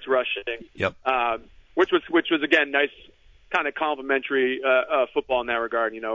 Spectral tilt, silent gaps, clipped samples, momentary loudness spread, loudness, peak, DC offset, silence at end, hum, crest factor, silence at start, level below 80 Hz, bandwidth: -5 dB/octave; none; under 0.1%; 8 LU; -24 LUFS; -6 dBFS; under 0.1%; 0 s; none; 18 dB; 0 s; -58 dBFS; 7.6 kHz